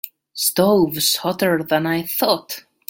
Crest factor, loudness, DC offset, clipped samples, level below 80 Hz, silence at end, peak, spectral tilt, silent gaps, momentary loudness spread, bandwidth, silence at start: 18 dB; -18 LUFS; under 0.1%; under 0.1%; -58 dBFS; 0.3 s; -2 dBFS; -3.5 dB/octave; none; 6 LU; 17 kHz; 0.05 s